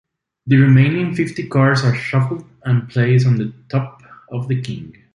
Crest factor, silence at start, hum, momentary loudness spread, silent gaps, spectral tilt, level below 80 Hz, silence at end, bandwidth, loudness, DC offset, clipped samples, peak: 14 dB; 0.45 s; none; 16 LU; none; -8 dB/octave; -52 dBFS; 0.25 s; 10 kHz; -17 LUFS; under 0.1%; under 0.1%; -2 dBFS